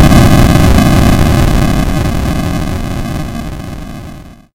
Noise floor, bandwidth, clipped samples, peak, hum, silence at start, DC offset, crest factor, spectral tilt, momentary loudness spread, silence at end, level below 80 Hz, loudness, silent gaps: -30 dBFS; 17 kHz; 0.8%; 0 dBFS; none; 0 s; under 0.1%; 10 dB; -6 dB/octave; 18 LU; 0.2 s; -16 dBFS; -10 LUFS; none